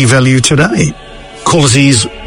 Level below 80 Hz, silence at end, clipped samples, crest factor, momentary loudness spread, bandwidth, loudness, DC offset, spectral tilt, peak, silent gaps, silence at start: -34 dBFS; 0 s; 0.5%; 10 dB; 9 LU; 11 kHz; -9 LUFS; under 0.1%; -4.5 dB/octave; 0 dBFS; none; 0 s